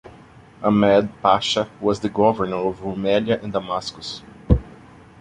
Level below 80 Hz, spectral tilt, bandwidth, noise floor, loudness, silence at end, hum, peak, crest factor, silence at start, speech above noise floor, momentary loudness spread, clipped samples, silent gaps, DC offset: -34 dBFS; -6 dB/octave; 10.5 kHz; -46 dBFS; -21 LUFS; 0.5 s; none; -2 dBFS; 20 dB; 0.05 s; 26 dB; 10 LU; under 0.1%; none; under 0.1%